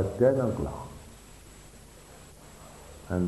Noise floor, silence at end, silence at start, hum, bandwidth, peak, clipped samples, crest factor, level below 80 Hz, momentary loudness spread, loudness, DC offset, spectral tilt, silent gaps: -50 dBFS; 0 s; 0 s; none; 12 kHz; -10 dBFS; under 0.1%; 22 dB; -48 dBFS; 26 LU; -28 LUFS; under 0.1%; -7.5 dB/octave; none